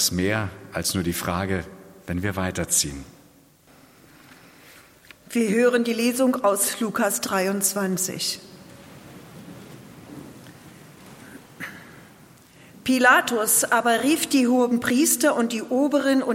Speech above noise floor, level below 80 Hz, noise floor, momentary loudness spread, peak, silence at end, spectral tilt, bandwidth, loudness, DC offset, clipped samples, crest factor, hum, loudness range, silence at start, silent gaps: 32 dB; -58 dBFS; -54 dBFS; 24 LU; -4 dBFS; 0 s; -3.5 dB/octave; 16.5 kHz; -22 LUFS; under 0.1%; under 0.1%; 20 dB; none; 22 LU; 0 s; none